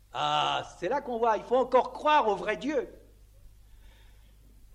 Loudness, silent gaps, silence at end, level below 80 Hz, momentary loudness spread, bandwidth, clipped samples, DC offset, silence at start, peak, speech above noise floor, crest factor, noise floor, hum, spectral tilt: -28 LUFS; none; 1.25 s; -56 dBFS; 8 LU; 11.5 kHz; under 0.1%; under 0.1%; 0.15 s; -10 dBFS; 28 dB; 18 dB; -55 dBFS; 50 Hz at -55 dBFS; -4 dB/octave